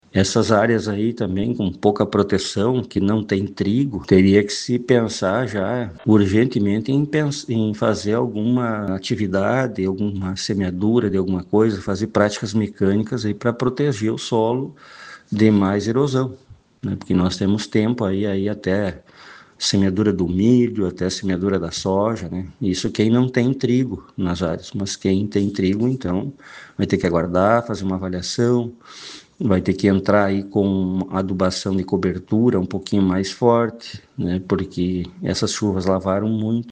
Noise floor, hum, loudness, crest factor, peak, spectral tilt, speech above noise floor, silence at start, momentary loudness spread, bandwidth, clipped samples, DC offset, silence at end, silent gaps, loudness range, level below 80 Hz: -44 dBFS; none; -20 LUFS; 20 dB; 0 dBFS; -6 dB/octave; 25 dB; 0.15 s; 8 LU; 9.6 kHz; under 0.1%; under 0.1%; 0 s; none; 3 LU; -54 dBFS